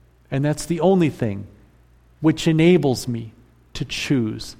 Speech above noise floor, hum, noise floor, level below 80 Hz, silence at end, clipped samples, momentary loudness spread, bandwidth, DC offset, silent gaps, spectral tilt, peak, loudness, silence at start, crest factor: 34 dB; none; -53 dBFS; -46 dBFS; 0.05 s; under 0.1%; 16 LU; 16 kHz; under 0.1%; none; -6.5 dB/octave; -4 dBFS; -20 LUFS; 0.3 s; 16 dB